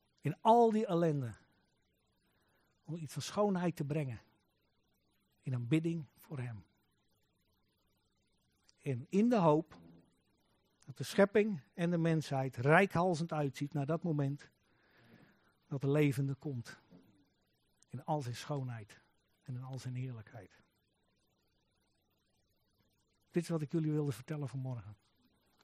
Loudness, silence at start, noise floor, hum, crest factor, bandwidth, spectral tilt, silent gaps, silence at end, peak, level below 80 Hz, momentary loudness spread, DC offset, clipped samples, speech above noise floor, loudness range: -35 LUFS; 0.25 s; -78 dBFS; none; 26 dB; 15 kHz; -7 dB/octave; none; 0.7 s; -12 dBFS; -76 dBFS; 18 LU; under 0.1%; under 0.1%; 44 dB; 13 LU